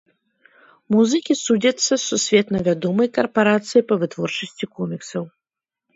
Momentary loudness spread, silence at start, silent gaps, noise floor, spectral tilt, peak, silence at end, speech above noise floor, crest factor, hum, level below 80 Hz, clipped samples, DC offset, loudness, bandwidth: 11 LU; 0.9 s; none; -87 dBFS; -4 dB/octave; -2 dBFS; 0.65 s; 68 dB; 18 dB; none; -60 dBFS; under 0.1%; under 0.1%; -20 LUFS; 8 kHz